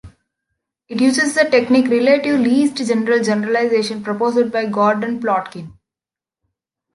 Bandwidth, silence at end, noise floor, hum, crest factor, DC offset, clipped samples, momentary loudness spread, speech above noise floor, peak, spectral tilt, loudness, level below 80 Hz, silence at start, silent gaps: 11.5 kHz; 1.25 s; -89 dBFS; none; 16 dB; under 0.1%; under 0.1%; 6 LU; 74 dB; -2 dBFS; -4.5 dB/octave; -16 LUFS; -58 dBFS; 0.05 s; none